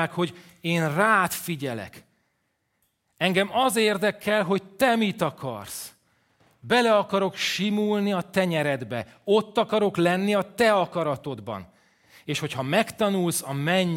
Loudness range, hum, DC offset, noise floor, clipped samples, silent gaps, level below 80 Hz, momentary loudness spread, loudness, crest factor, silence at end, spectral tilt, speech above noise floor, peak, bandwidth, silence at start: 2 LU; none; under 0.1%; -74 dBFS; under 0.1%; none; -66 dBFS; 13 LU; -24 LUFS; 20 dB; 0 s; -4.5 dB/octave; 50 dB; -6 dBFS; 16.5 kHz; 0 s